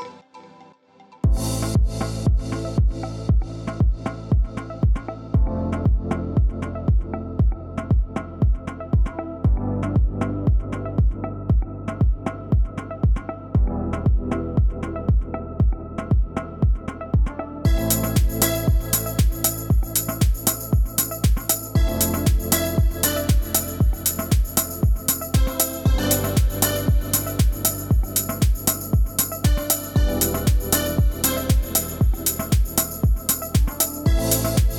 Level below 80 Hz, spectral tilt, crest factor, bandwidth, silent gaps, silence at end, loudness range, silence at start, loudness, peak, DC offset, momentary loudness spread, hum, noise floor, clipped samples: -24 dBFS; -5 dB/octave; 20 dB; over 20 kHz; none; 0 s; 3 LU; 0 s; -22 LUFS; -2 dBFS; under 0.1%; 5 LU; none; -51 dBFS; under 0.1%